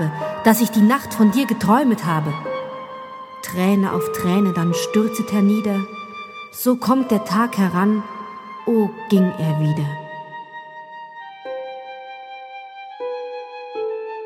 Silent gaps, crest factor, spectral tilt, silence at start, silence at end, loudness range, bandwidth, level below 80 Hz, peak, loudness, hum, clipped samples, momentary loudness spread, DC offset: none; 20 dB; -6.5 dB/octave; 0 s; 0 s; 12 LU; 18.5 kHz; -62 dBFS; 0 dBFS; -19 LUFS; none; under 0.1%; 19 LU; under 0.1%